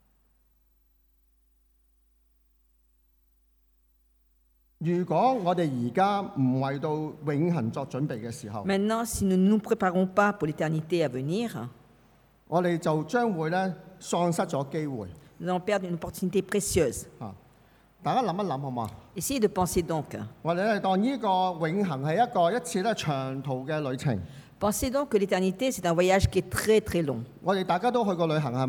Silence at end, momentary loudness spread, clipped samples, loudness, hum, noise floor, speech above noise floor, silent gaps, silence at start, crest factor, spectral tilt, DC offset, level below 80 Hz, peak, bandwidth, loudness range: 0 s; 10 LU; under 0.1%; -28 LUFS; none; -66 dBFS; 39 dB; none; 4.8 s; 18 dB; -5.5 dB/octave; under 0.1%; -52 dBFS; -10 dBFS; 19 kHz; 4 LU